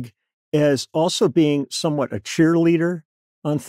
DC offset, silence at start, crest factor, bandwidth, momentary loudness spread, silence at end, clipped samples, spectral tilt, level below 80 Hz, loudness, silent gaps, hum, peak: under 0.1%; 0 s; 16 dB; 14.5 kHz; 9 LU; 0 s; under 0.1%; -5.5 dB/octave; -68 dBFS; -20 LUFS; 0.33-0.52 s, 3.05-3.42 s; none; -6 dBFS